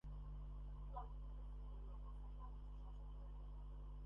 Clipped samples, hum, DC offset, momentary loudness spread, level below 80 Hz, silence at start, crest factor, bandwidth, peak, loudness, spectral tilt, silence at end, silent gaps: under 0.1%; 50 Hz at -50 dBFS; under 0.1%; 3 LU; -52 dBFS; 0.05 s; 14 dB; 3.5 kHz; -38 dBFS; -56 LUFS; -8.5 dB/octave; 0 s; none